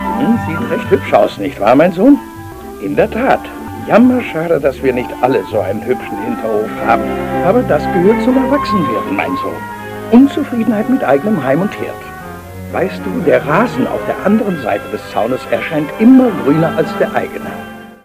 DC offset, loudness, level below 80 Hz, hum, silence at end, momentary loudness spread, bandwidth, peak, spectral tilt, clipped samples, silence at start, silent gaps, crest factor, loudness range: under 0.1%; -13 LUFS; -40 dBFS; none; 0.1 s; 15 LU; 15.5 kHz; 0 dBFS; -7 dB/octave; 0.1%; 0 s; none; 14 dB; 3 LU